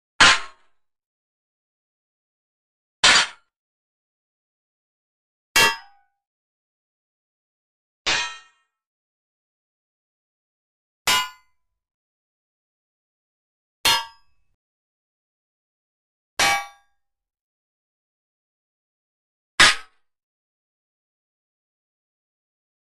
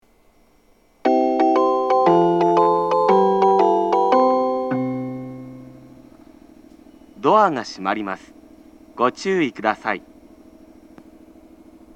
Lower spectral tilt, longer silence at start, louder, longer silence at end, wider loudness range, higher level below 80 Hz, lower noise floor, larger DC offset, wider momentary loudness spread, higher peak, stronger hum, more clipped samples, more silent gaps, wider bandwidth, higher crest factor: second, 0.5 dB/octave vs -6.5 dB/octave; second, 0.2 s vs 1.05 s; about the same, -18 LUFS vs -18 LUFS; first, 3.15 s vs 1.95 s; about the same, 8 LU vs 9 LU; first, -54 dBFS vs -60 dBFS; first, -71 dBFS vs -57 dBFS; neither; first, 17 LU vs 13 LU; about the same, -2 dBFS vs -2 dBFS; neither; neither; first, 1.06-3.03 s, 3.56-5.55 s, 6.27-8.05 s, 8.86-11.05 s, 11.94-13.84 s, 14.54-16.37 s, 17.41-19.58 s vs none; first, 13.5 kHz vs 8.6 kHz; first, 24 dB vs 18 dB